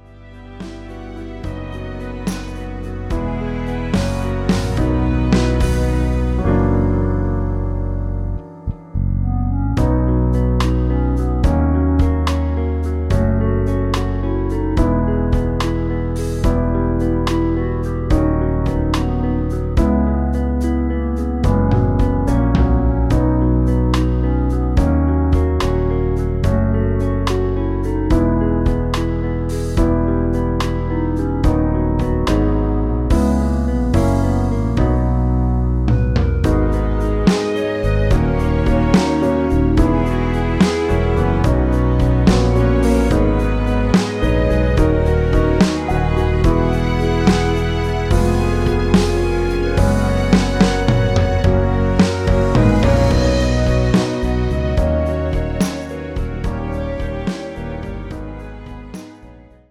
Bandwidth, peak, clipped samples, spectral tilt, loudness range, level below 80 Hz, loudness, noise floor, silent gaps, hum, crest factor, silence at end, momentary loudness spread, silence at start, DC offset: 13 kHz; 0 dBFS; under 0.1%; -7.5 dB/octave; 5 LU; -20 dBFS; -17 LUFS; -41 dBFS; none; none; 16 dB; 0.35 s; 9 LU; 0.1 s; under 0.1%